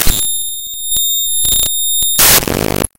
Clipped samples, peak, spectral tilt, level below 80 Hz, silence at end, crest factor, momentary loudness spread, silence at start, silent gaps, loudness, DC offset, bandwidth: 0.3%; 0 dBFS; -1 dB/octave; -26 dBFS; 0.1 s; 14 dB; 10 LU; 0 s; none; -11 LUFS; under 0.1%; over 20 kHz